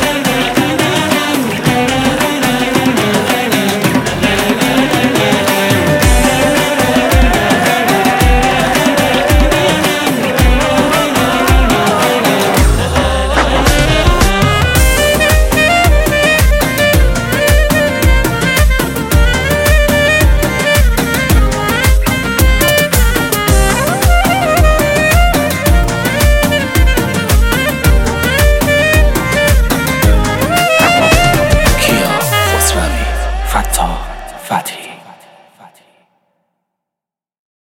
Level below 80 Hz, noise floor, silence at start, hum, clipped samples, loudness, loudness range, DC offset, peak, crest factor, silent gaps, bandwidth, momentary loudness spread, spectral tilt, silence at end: -16 dBFS; -85 dBFS; 0 s; none; under 0.1%; -11 LUFS; 2 LU; under 0.1%; 0 dBFS; 10 dB; none; 17 kHz; 4 LU; -4.5 dB/octave; 2.7 s